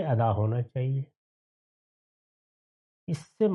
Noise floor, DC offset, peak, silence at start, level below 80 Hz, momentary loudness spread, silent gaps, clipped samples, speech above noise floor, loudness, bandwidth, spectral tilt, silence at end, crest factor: under -90 dBFS; under 0.1%; -14 dBFS; 0 s; -70 dBFS; 14 LU; 1.16-3.07 s; under 0.1%; over 63 dB; -29 LUFS; 11.5 kHz; -9 dB/octave; 0 s; 16 dB